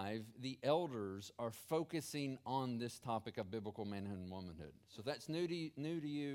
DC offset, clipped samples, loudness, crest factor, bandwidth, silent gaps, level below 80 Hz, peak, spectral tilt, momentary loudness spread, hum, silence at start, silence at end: under 0.1%; under 0.1%; -44 LUFS; 20 dB; 17 kHz; none; -76 dBFS; -22 dBFS; -5.5 dB/octave; 10 LU; none; 0 s; 0 s